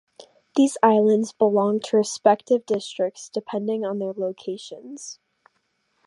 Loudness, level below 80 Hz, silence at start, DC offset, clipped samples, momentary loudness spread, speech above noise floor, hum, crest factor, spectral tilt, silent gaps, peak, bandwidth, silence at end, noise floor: -22 LUFS; -78 dBFS; 0.55 s; under 0.1%; under 0.1%; 17 LU; 49 dB; none; 20 dB; -5 dB/octave; none; -2 dBFS; 11.5 kHz; 0.95 s; -71 dBFS